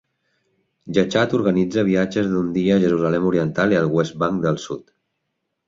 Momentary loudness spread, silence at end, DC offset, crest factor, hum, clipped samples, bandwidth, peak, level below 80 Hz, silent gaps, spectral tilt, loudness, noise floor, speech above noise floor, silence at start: 5 LU; 0.85 s; under 0.1%; 16 dB; none; under 0.1%; 7.6 kHz; -4 dBFS; -52 dBFS; none; -7 dB/octave; -19 LUFS; -76 dBFS; 57 dB; 0.85 s